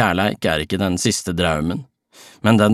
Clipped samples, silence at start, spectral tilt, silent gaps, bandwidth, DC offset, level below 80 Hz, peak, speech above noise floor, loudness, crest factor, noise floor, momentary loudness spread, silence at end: under 0.1%; 0 s; -5 dB/octave; none; 14.5 kHz; under 0.1%; -42 dBFS; -2 dBFS; 29 dB; -19 LUFS; 18 dB; -47 dBFS; 5 LU; 0 s